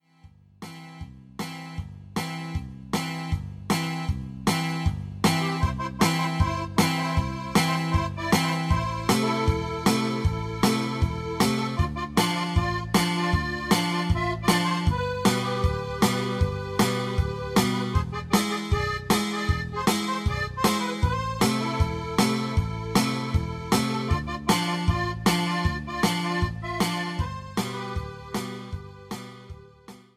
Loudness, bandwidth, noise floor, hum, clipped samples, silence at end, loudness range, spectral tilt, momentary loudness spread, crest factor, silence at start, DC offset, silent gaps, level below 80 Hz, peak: -26 LUFS; 16 kHz; -54 dBFS; none; under 0.1%; 0.2 s; 5 LU; -5 dB/octave; 11 LU; 18 dB; 0.25 s; under 0.1%; none; -36 dBFS; -8 dBFS